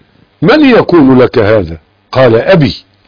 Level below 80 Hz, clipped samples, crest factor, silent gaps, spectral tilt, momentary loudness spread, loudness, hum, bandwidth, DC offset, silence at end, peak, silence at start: -36 dBFS; 1%; 8 dB; none; -8.5 dB/octave; 8 LU; -7 LUFS; none; 5.4 kHz; under 0.1%; 0.3 s; 0 dBFS; 0.4 s